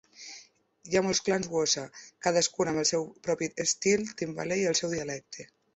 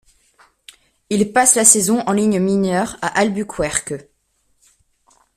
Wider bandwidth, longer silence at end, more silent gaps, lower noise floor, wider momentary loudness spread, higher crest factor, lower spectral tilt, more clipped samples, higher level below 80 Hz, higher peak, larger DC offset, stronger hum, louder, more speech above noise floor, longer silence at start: second, 8.4 kHz vs 16 kHz; second, 0.3 s vs 1.35 s; neither; second, -56 dBFS vs -64 dBFS; first, 18 LU vs 12 LU; about the same, 20 dB vs 18 dB; about the same, -3 dB/octave vs -3.5 dB/octave; neither; second, -64 dBFS vs -50 dBFS; second, -10 dBFS vs 0 dBFS; neither; neither; second, -28 LUFS vs -15 LUFS; second, 26 dB vs 48 dB; second, 0.2 s vs 1.1 s